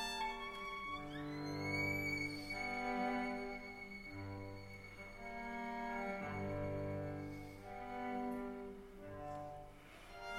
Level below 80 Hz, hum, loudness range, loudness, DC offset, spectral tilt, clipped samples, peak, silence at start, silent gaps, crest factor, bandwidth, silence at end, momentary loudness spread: -60 dBFS; none; 5 LU; -44 LUFS; under 0.1%; -5.5 dB/octave; under 0.1%; -28 dBFS; 0 s; none; 16 dB; 16 kHz; 0 s; 13 LU